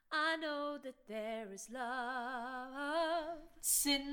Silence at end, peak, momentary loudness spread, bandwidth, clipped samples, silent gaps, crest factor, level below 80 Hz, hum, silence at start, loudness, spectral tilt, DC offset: 0 s; -20 dBFS; 13 LU; 19 kHz; under 0.1%; none; 18 dB; -66 dBFS; none; 0.1 s; -38 LUFS; -0.5 dB/octave; under 0.1%